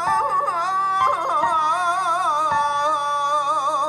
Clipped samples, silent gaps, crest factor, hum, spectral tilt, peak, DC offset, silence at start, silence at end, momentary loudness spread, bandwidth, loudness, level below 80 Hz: under 0.1%; none; 12 dB; none; -2 dB/octave; -8 dBFS; under 0.1%; 0 s; 0 s; 2 LU; 13 kHz; -20 LUFS; -64 dBFS